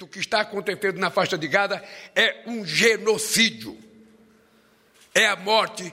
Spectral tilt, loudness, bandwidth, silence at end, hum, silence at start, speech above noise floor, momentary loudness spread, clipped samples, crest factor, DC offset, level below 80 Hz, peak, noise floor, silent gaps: -2 dB/octave; -22 LUFS; 16 kHz; 0 s; none; 0 s; 36 dB; 8 LU; under 0.1%; 18 dB; under 0.1%; -66 dBFS; -6 dBFS; -59 dBFS; none